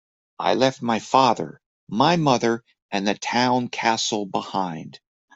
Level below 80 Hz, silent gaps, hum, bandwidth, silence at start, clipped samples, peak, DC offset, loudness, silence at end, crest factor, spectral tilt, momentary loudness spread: -64 dBFS; 1.66-1.87 s, 2.82-2.89 s; none; 8.2 kHz; 0.4 s; under 0.1%; -2 dBFS; under 0.1%; -22 LUFS; 0.45 s; 20 dB; -4.5 dB/octave; 12 LU